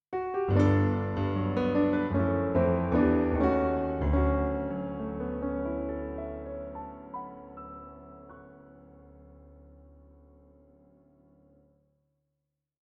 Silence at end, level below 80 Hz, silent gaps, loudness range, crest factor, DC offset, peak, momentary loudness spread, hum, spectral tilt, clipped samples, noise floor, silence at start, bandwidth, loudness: 3.15 s; -42 dBFS; none; 20 LU; 18 dB; under 0.1%; -12 dBFS; 19 LU; none; -10 dB/octave; under 0.1%; -84 dBFS; 0.1 s; 6.8 kHz; -29 LUFS